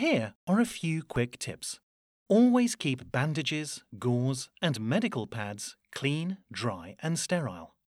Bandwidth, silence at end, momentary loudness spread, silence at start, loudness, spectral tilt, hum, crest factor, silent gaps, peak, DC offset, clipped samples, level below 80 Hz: 13.5 kHz; 0.3 s; 13 LU; 0 s; -30 LUFS; -5 dB/octave; none; 18 dB; 0.35-0.47 s, 1.83-2.26 s; -12 dBFS; under 0.1%; under 0.1%; -62 dBFS